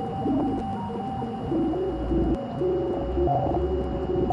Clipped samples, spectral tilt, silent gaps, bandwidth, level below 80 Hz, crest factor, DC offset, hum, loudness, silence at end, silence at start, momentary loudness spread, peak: under 0.1%; -9.5 dB/octave; none; 9.6 kHz; -36 dBFS; 14 dB; under 0.1%; none; -27 LUFS; 0 s; 0 s; 6 LU; -12 dBFS